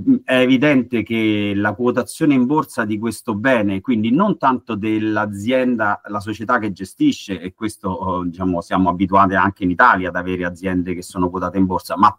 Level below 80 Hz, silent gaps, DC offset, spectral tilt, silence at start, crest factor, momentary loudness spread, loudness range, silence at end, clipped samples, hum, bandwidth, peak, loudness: -52 dBFS; none; under 0.1%; -6 dB/octave; 0 s; 18 dB; 10 LU; 3 LU; 0.05 s; under 0.1%; none; 16 kHz; 0 dBFS; -18 LUFS